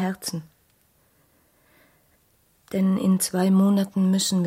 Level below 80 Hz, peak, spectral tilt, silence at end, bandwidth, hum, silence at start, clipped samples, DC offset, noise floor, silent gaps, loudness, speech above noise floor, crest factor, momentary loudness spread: -66 dBFS; -10 dBFS; -5.5 dB/octave; 0 s; 16.5 kHz; none; 0 s; under 0.1%; under 0.1%; -63 dBFS; none; -22 LUFS; 42 dB; 14 dB; 12 LU